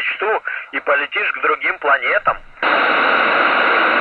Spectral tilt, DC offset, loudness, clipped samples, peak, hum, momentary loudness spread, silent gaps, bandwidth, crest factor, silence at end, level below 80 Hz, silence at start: -4.5 dB/octave; under 0.1%; -16 LUFS; under 0.1%; -2 dBFS; none; 7 LU; none; 6 kHz; 14 dB; 0 s; -50 dBFS; 0 s